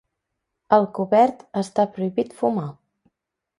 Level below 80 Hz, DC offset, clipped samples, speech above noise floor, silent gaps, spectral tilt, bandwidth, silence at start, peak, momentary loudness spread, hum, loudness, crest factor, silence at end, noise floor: -66 dBFS; under 0.1%; under 0.1%; 59 dB; none; -7 dB/octave; 11.5 kHz; 0.7 s; -2 dBFS; 10 LU; none; -21 LUFS; 22 dB; 0.9 s; -80 dBFS